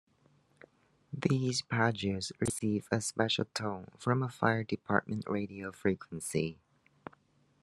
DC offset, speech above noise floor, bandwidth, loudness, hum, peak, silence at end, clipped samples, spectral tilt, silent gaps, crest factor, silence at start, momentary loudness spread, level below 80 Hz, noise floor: under 0.1%; 36 dB; 12.5 kHz; -33 LUFS; none; -10 dBFS; 1.1 s; under 0.1%; -5 dB/octave; none; 24 dB; 1.1 s; 9 LU; -68 dBFS; -69 dBFS